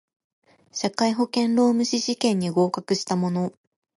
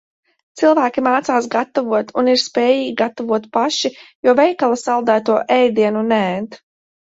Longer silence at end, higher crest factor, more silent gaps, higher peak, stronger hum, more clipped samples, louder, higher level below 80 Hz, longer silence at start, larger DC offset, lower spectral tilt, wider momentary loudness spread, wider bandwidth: about the same, 0.45 s vs 0.5 s; about the same, 16 dB vs 16 dB; second, none vs 4.15-4.23 s; second, -6 dBFS vs -2 dBFS; neither; neither; second, -23 LUFS vs -16 LUFS; second, -70 dBFS vs -64 dBFS; first, 0.75 s vs 0.55 s; neither; about the same, -5 dB/octave vs -4 dB/octave; about the same, 8 LU vs 7 LU; first, 11.5 kHz vs 8 kHz